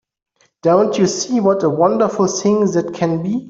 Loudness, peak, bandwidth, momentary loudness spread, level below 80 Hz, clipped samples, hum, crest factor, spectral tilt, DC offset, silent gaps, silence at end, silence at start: -16 LUFS; -2 dBFS; 7.8 kHz; 5 LU; -58 dBFS; under 0.1%; none; 14 dB; -5.5 dB/octave; under 0.1%; none; 0 s; 0.65 s